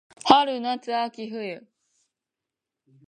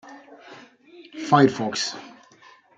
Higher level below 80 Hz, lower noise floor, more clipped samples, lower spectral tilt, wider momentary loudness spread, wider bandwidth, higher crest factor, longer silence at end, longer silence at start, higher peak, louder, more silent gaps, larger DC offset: about the same, -70 dBFS vs -72 dBFS; first, -87 dBFS vs -53 dBFS; neither; about the same, -4 dB/octave vs -5 dB/octave; second, 16 LU vs 26 LU; about the same, 10 kHz vs 9.2 kHz; about the same, 26 dB vs 22 dB; first, 1.5 s vs 0.7 s; first, 0.25 s vs 0.05 s; about the same, 0 dBFS vs -2 dBFS; about the same, -23 LUFS vs -21 LUFS; neither; neither